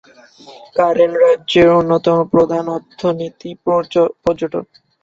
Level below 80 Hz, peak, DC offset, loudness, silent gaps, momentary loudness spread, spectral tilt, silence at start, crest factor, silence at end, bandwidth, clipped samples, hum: -50 dBFS; -2 dBFS; under 0.1%; -15 LUFS; none; 13 LU; -7 dB/octave; 0.5 s; 14 dB; 0.4 s; 7.6 kHz; under 0.1%; none